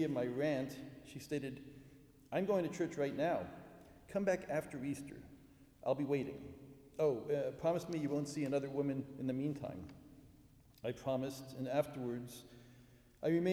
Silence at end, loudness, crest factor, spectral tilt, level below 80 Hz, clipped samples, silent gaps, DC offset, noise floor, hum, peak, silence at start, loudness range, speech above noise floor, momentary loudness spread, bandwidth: 0 s; -39 LUFS; 18 dB; -6.5 dB/octave; -70 dBFS; under 0.1%; none; under 0.1%; -64 dBFS; none; -22 dBFS; 0 s; 4 LU; 26 dB; 18 LU; over 20 kHz